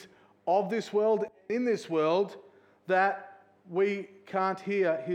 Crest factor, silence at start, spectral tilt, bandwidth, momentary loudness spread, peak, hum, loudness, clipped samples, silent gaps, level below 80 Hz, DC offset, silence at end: 16 dB; 0 s; -6 dB/octave; 9.4 kHz; 9 LU; -12 dBFS; none; -29 LUFS; under 0.1%; none; -86 dBFS; under 0.1%; 0 s